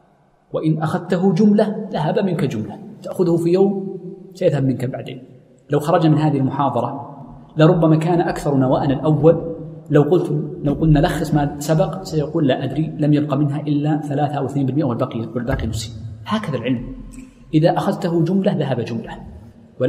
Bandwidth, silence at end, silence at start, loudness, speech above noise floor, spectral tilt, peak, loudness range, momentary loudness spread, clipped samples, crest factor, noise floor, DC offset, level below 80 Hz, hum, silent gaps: 14.5 kHz; 0 s; 0.55 s; -18 LUFS; 38 dB; -8 dB/octave; 0 dBFS; 4 LU; 15 LU; under 0.1%; 18 dB; -55 dBFS; under 0.1%; -40 dBFS; none; none